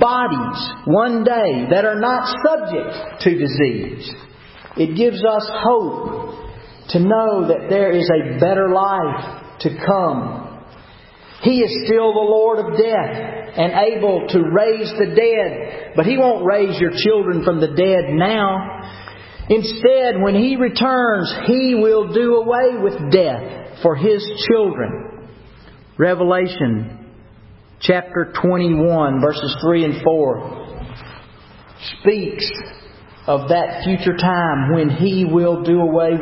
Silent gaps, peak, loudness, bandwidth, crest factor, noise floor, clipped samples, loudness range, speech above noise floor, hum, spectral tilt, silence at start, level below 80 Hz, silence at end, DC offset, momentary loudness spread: none; 0 dBFS; -17 LUFS; 5.8 kHz; 16 dB; -43 dBFS; under 0.1%; 4 LU; 27 dB; none; -10.5 dB/octave; 0 s; -46 dBFS; 0 s; under 0.1%; 14 LU